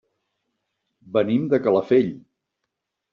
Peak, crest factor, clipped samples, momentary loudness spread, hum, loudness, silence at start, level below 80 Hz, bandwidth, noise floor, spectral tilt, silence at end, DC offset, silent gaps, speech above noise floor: -6 dBFS; 18 dB; under 0.1%; 7 LU; none; -21 LUFS; 1.1 s; -66 dBFS; 5.8 kHz; -81 dBFS; -6.5 dB/octave; 0.95 s; under 0.1%; none; 61 dB